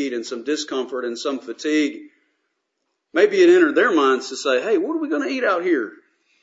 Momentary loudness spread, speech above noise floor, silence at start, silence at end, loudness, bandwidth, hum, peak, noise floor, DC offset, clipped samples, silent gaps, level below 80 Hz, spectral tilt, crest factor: 13 LU; 56 dB; 0 s; 0.5 s; -20 LUFS; 8 kHz; none; -2 dBFS; -75 dBFS; under 0.1%; under 0.1%; none; -80 dBFS; -3 dB/octave; 18 dB